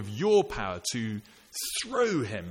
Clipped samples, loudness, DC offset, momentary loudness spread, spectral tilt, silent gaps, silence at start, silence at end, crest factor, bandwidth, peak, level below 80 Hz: under 0.1%; -29 LUFS; under 0.1%; 11 LU; -4 dB/octave; none; 0 s; 0 s; 16 dB; 17 kHz; -12 dBFS; -54 dBFS